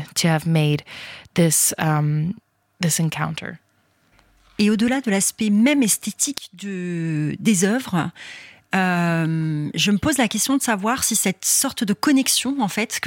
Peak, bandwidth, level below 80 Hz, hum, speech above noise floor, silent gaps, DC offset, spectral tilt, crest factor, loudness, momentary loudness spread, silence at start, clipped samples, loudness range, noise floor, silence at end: -4 dBFS; 17 kHz; -56 dBFS; none; 41 dB; none; under 0.1%; -4 dB/octave; 18 dB; -20 LUFS; 12 LU; 0 s; under 0.1%; 4 LU; -62 dBFS; 0 s